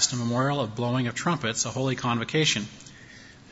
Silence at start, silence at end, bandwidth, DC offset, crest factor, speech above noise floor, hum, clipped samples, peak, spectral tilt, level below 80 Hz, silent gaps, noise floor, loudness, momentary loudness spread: 0 s; 0 s; 8 kHz; under 0.1%; 18 dB; 22 dB; none; under 0.1%; -10 dBFS; -3.5 dB/octave; -60 dBFS; none; -48 dBFS; -26 LUFS; 22 LU